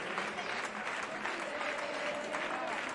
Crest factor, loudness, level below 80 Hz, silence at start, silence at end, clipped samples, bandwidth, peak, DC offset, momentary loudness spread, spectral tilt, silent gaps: 18 dB; -37 LUFS; -74 dBFS; 0 s; 0 s; under 0.1%; 11.5 kHz; -20 dBFS; under 0.1%; 1 LU; -2.5 dB/octave; none